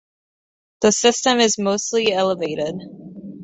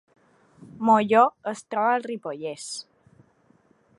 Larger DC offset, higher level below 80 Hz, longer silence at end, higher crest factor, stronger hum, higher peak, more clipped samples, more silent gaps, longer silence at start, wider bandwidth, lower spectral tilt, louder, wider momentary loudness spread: neither; first, -60 dBFS vs -72 dBFS; second, 0 s vs 1.15 s; about the same, 18 dB vs 22 dB; neither; about the same, -2 dBFS vs -4 dBFS; neither; neither; about the same, 0.8 s vs 0.75 s; second, 8.4 kHz vs 11.5 kHz; second, -2.5 dB/octave vs -4.5 dB/octave; first, -18 LUFS vs -24 LUFS; first, 20 LU vs 16 LU